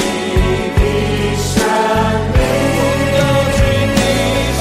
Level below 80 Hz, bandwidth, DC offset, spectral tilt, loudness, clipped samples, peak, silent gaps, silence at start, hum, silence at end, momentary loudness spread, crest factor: -22 dBFS; 16 kHz; under 0.1%; -5 dB/octave; -14 LUFS; under 0.1%; 0 dBFS; none; 0 s; none; 0 s; 3 LU; 12 dB